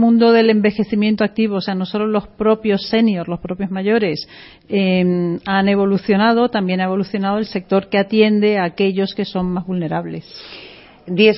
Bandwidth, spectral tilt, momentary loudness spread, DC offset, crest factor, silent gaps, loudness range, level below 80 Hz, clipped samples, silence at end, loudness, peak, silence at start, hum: 5.8 kHz; -10 dB/octave; 10 LU; under 0.1%; 16 dB; none; 2 LU; -50 dBFS; under 0.1%; 0 s; -17 LUFS; 0 dBFS; 0 s; none